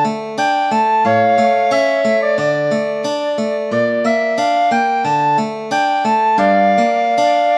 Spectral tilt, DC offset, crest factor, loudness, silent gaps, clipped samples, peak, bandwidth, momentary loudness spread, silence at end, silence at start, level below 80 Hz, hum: -5 dB/octave; under 0.1%; 12 dB; -15 LUFS; none; under 0.1%; -2 dBFS; 10.5 kHz; 6 LU; 0 s; 0 s; -70 dBFS; none